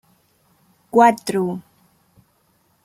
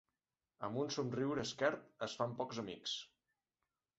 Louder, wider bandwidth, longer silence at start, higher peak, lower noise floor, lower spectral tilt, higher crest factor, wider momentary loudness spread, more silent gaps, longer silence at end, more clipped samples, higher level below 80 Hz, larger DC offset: first, -18 LUFS vs -41 LUFS; first, 16 kHz vs 8 kHz; first, 0.95 s vs 0.6 s; first, -2 dBFS vs -20 dBFS; second, -62 dBFS vs under -90 dBFS; first, -5.5 dB/octave vs -3.5 dB/octave; about the same, 20 dB vs 22 dB; first, 12 LU vs 8 LU; neither; first, 1.25 s vs 0.9 s; neither; first, -66 dBFS vs -78 dBFS; neither